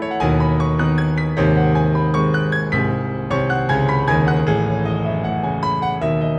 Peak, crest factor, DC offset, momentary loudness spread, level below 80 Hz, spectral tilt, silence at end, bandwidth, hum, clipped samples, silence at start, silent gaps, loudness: -4 dBFS; 12 dB; under 0.1%; 5 LU; -34 dBFS; -8.5 dB/octave; 0 s; 6.6 kHz; none; under 0.1%; 0 s; none; -18 LUFS